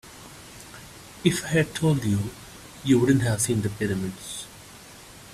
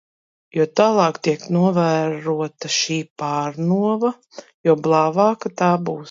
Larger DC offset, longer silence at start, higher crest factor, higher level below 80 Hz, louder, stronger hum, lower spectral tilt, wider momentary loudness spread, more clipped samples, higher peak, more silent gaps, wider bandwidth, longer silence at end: neither; second, 0.05 s vs 0.55 s; about the same, 22 dB vs 18 dB; first, -52 dBFS vs -68 dBFS; second, -25 LUFS vs -19 LUFS; neither; about the same, -5.5 dB/octave vs -5.5 dB/octave; first, 22 LU vs 8 LU; neither; about the same, -4 dBFS vs -2 dBFS; second, none vs 3.10-3.16 s, 4.54-4.64 s; first, 15.5 kHz vs 7.6 kHz; about the same, 0 s vs 0 s